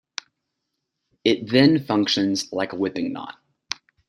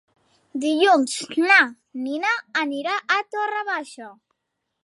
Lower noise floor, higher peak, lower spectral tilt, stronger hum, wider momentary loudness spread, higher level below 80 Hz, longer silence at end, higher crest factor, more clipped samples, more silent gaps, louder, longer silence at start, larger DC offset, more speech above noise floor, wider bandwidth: about the same, -79 dBFS vs -79 dBFS; about the same, -2 dBFS vs -2 dBFS; first, -5 dB/octave vs -1.5 dB/octave; neither; first, 18 LU vs 14 LU; first, -64 dBFS vs -82 dBFS; second, 0.35 s vs 0.7 s; about the same, 22 dB vs 20 dB; neither; neither; about the same, -21 LUFS vs -21 LUFS; first, 1.25 s vs 0.55 s; neither; about the same, 58 dB vs 57 dB; about the same, 12 kHz vs 11.5 kHz